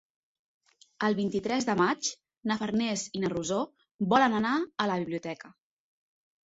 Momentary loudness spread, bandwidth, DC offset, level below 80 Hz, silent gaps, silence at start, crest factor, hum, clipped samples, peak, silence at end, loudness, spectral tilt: 11 LU; 8 kHz; under 0.1%; -68 dBFS; 3.91-3.99 s; 1 s; 24 dB; none; under 0.1%; -8 dBFS; 1 s; -29 LUFS; -4.5 dB/octave